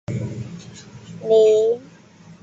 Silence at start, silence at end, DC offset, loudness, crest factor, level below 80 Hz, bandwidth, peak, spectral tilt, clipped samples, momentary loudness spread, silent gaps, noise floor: 0.1 s; 0.1 s; under 0.1%; -18 LUFS; 16 dB; -54 dBFS; 7.8 kHz; -6 dBFS; -6.5 dB/octave; under 0.1%; 25 LU; none; -46 dBFS